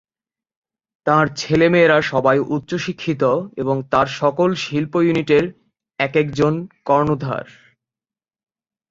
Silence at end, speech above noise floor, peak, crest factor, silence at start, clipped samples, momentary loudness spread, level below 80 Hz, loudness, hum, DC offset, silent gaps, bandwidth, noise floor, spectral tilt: 1.45 s; over 72 dB; 0 dBFS; 18 dB; 1.05 s; under 0.1%; 9 LU; -54 dBFS; -18 LUFS; none; under 0.1%; none; 7.8 kHz; under -90 dBFS; -6.5 dB/octave